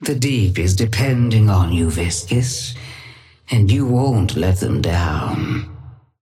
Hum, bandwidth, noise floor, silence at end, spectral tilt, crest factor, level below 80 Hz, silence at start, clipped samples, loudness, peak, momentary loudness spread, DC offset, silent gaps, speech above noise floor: none; 15 kHz; -42 dBFS; 0.3 s; -5.5 dB/octave; 14 dB; -34 dBFS; 0 s; under 0.1%; -18 LUFS; -4 dBFS; 11 LU; under 0.1%; none; 25 dB